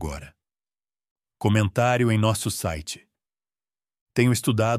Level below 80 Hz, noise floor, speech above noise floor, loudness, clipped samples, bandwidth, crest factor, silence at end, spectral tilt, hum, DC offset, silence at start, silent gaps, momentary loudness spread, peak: -48 dBFS; under -90 dBFS; over 68 dB; -23 LUFS; under 0.1%; 15.5 kHz; 20 dB; 0 s; -5.5 dB/octave; none; under 0.1%; 0 s; 1.11-1.16 s, 4.01-4.06 s; 14 LU; -6 dBFS